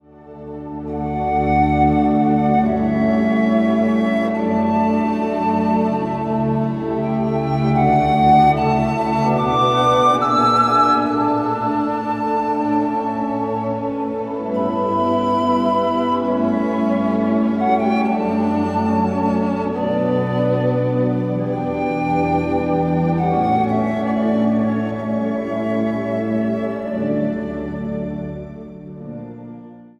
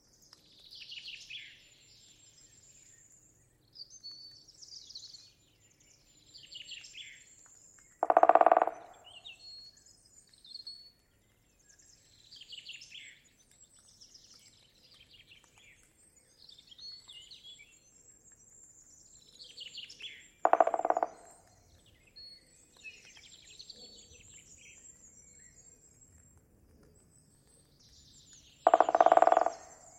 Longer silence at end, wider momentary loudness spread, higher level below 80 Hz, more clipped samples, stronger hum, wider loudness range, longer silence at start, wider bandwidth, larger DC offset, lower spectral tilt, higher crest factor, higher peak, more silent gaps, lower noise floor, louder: second, 0.1 s vs 0.4 s; second, 10 LU vs 30 LU; first, -42 dBFS vs -74 dBFS; neither; neither; second, 5 LU vs 22 LU; second, 0.2 s vs 0.9 s; second, 8.6 kHz vs 10.5 kHz; neither; first, -8 dB/octave vs -2.5 dB/octave; second, 14 dB vs 30 dB; about the same, -4 dBFS vs -6 dBFS; neither; second, -38 dBFS vs -69 dBFS; first, -18 LUFS vs -30 LUFS